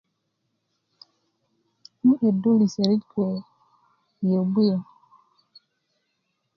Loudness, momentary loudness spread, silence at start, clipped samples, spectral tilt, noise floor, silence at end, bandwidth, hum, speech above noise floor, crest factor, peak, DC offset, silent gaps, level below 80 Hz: -23 LUFS; 9 LU; 2.05 s; under 0.1%; -8.5 dB/octave; -76 dBFS; 1.75 s; 7 kHz; none; 54 dB; 18 dB; -6 dBFS; under 0.1%; none; -72 dBFS